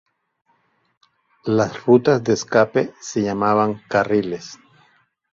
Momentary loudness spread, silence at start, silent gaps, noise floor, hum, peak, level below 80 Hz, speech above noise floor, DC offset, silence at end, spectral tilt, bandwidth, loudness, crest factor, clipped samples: 12 LU; 1.45 s; none; -64 dBFS; none; -2 dBFS; -58 dBFS; 46 dB; under 0.1%; 0.8 s; -6 dB/octave; 7.6 kHz; -19 LUFS; 20 dB; under 0.1%